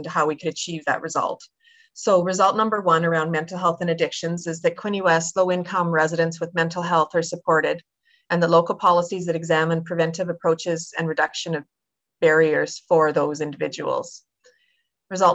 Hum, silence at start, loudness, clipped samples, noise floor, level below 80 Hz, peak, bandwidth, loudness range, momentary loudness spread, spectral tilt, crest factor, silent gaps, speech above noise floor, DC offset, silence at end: none; 0 s; -22 LUFS; under 0.1%; -69 dBFS; -68 dBFS; -6 dBFS; 8.6 kHz; 1 LU; 9 LU; -5 dB/octave; 16 dB; none; 48 dB; under 0.1%; 0 s